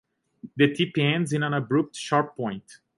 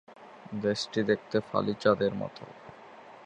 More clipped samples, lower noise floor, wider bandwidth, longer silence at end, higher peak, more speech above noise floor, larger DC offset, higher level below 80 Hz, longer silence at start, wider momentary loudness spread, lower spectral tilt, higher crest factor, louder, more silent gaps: neither; about the same, -47 dBFS vs -50 dBFS; first, 11.5 kHz vs 10 kHz; first, 0.25 s vs 0 s; about the same, -8 dBFS vs -10 dBFS; about the same, 22 dB vs 21 dB; neither; about the same, -68 dBFS vs -66 dBFS; first, 0.45 s vs 0.1 s; second, 10 LU vs 23 LU; about the same, -6 dB/octave vs -5.5 dB/octave; about the same, 18 dB vs 22 dB; first, -25 LUFS vs -29 LUFS; neither